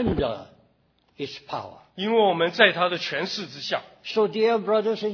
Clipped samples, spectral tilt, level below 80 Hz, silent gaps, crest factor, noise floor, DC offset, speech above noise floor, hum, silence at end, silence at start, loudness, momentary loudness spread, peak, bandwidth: under 0.1%; -5 dB/octave; -50 dBFS; none; 24 dB; -65 dBFS; under 0.1%; 41 dB; none; 0 s; 0 s; -23 LUFS; 17 LU; -2 dBFS; 5.4 kHz